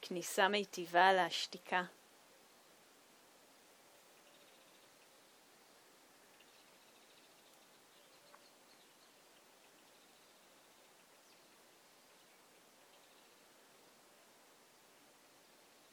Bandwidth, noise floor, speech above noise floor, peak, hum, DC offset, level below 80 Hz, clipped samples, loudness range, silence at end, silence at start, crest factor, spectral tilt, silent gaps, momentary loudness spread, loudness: over 20 kHz; -66 dBFS; 31 dB; -14 dBFS; none; under 0.1%; under -90 dBFS; under 0.1%; 26 LU; 14 s; 0 s; 30 dB; -2.5 dB/octave; none; 29 LU; -35 LUFS